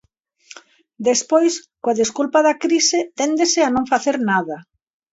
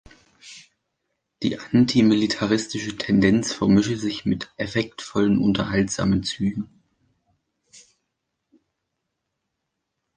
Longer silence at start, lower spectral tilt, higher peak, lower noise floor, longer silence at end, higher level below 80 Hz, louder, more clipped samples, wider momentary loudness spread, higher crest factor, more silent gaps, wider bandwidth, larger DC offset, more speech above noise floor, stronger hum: about the same, 0.55 s vs 0.45 s; second, -2.5 dB/octave vs -5.5 dB/octave; about the same, -2 dBFS vs -4 dBFS; second, -48 dBFS vs -80 dBFS; second, 0.5 s vs 3.5 s; second, -60 dBFS vs -50 dBFS; first, -18 LUFS vs -22 LUFS; neither; second, 7 LU vs 10 LU; about the same, 18 dB vs 20 dB; neither; second, 8 kHz vs 9.8 kHz; neither; second, 30 dB vs 59 dB; neither